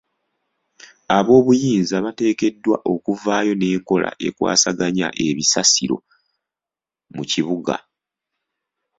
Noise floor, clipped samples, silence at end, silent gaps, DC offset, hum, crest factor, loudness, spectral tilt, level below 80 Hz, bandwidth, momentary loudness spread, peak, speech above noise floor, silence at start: -89 dBFS; under 0.1%; 1.2 s; none; under 0.1%; none; 20 dB; -18 LUFS; -3.5 dB/octave; -58 dBFS; 8 kHz; 11 LU; 0 dBFS; 71 dB; 1.1 s